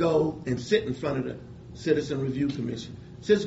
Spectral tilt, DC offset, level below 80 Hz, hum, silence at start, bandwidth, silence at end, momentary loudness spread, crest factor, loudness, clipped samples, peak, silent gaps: -6 dB/octave; under 0.1%; -54 dBFS; none; 0 s; 8 kHz; 0 s; 13 LU; 18 dB; -28 LUFS; under 0.1%; -10 dBFS; none